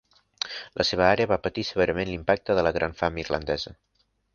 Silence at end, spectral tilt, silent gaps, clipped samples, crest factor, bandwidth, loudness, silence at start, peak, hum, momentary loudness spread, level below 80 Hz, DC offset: 0.6 s; -5 dB/octave; none; under 0.1%; 22 dB; 7.2 kHz; -26 LUFS; 0.45 s; -4 dBFS; none; 11 LU; -46 dBFS; under 0.1%